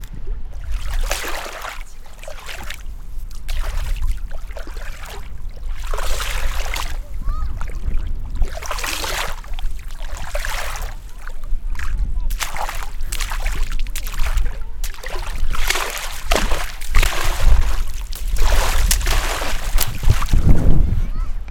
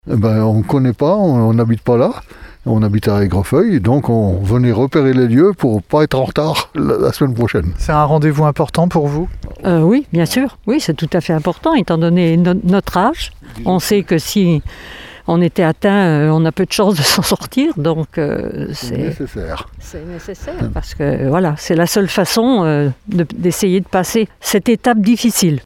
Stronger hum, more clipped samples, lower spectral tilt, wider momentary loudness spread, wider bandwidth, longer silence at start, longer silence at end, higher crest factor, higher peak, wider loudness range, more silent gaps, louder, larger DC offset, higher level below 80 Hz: neither; neither; second, -3.5 dB/octave vs -6 dB/octave; first, 14 LU vs 10 LU; about the same, 18.5 kHz vs 17 kHz; about the same, 0 s vs 0.05 s; about the same, 0 s vs 0.05 s; about the same, 16 dB vs 14 dB; about the same, 0 dBFS vs 0 dBFS; first, 9 LU vs 4 LU; neither; second, -24 LUFS vs -14 LUFS; neither; first, -20 dBFS vs -34 dBFS